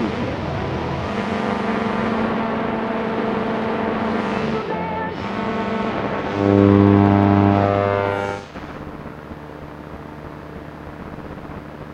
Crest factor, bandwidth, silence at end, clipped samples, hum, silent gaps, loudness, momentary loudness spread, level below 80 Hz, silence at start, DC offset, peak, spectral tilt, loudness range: 18 dB; 8.2 kHz; 0 s; under 0.1%; none; none; -20 LUFS; 20 LU; -44 dBFS; 0 s; under 0.1%; -2 dBFS; -8 dB/octave; 13 LU